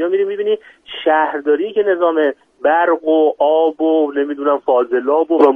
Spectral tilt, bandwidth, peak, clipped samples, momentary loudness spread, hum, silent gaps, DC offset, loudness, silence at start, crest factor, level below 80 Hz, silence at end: -6 dB/octave; 4 kHz; 0 dBFS; under 0.1%; 6 LU; none; none; under 0.1%; -16 LUFS; 0 s; 14 dB; -66 dBFS; 0 s